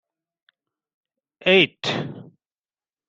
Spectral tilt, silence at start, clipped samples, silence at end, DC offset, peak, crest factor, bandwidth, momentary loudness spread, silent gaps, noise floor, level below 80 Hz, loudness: -5 dB/octave; 1.45 s; under 0.1%; 0.85 s; under 0.1%; -2 dBFS; 24 dB; 7.8 kHz; 13 LU; none; under -90 dBFS; -66 dBFS; -19 LUFS